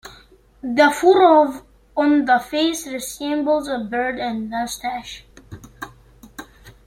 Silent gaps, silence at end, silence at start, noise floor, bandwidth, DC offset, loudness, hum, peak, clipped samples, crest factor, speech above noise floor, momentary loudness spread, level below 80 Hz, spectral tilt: none; 0.15 s; 0.05 s; -50 dBFS; 16.5 kHz; under 0.1%; -19 LUFS; none; -2 dBFS; under 0.1%; 18 dB; 31 dB; 24 LU; -52 dBFS; -3.5 dB/octave